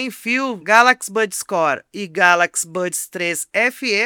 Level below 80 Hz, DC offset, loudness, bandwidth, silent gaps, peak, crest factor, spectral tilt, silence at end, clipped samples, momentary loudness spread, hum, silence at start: -70 dBFS; under 0.1%; -17 LUFS; over 20 kHz; none; 0 dBFS; 18 dB; -2 dB/octave; 0 s; 0.1%; 10 LU; none; 0 s